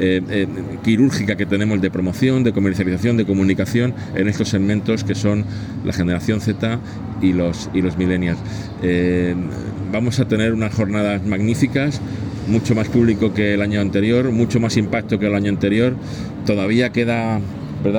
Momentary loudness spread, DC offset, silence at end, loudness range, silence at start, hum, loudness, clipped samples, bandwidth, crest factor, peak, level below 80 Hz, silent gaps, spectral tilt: 7 LU; under 0.1%; 0 s; 3 LU; 0 s; none; -19 LUFS; under 0.1%; 18 kHz; 14 dB; -4 dBFS; -44 dBFS; none; -7 dB/octave